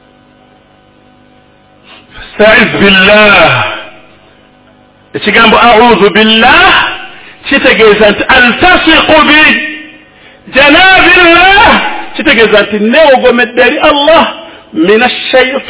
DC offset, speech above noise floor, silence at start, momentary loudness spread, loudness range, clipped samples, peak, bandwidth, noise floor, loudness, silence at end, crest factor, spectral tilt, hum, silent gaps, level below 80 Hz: 0.6%; 37 dB; 2.15 s; 12 LU; 3 LU; 10%; 0 dBFS; 4 kHz; -42 dBFS; -4 LUFS; 0 s; 6 dB; -7.5 dB/octave; 50 Hz at -40 dBFS; none; -32 dBFS